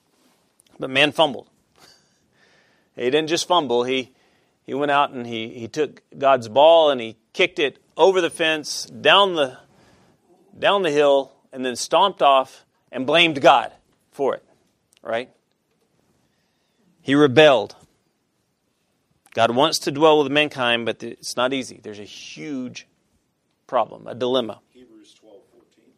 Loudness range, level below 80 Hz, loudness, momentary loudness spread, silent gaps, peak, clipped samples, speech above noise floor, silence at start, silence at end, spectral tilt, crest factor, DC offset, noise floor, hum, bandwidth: 10 LU; -70 dBFS; -19 LUFS; 19 LU; none; 0 dBFS; under 0.1%; 51 dB; 0.8 s; 1.45 s; -3.5 dB/octave; 22 dB; under 0.1%; -70 dBFS; none; 14.5 kHz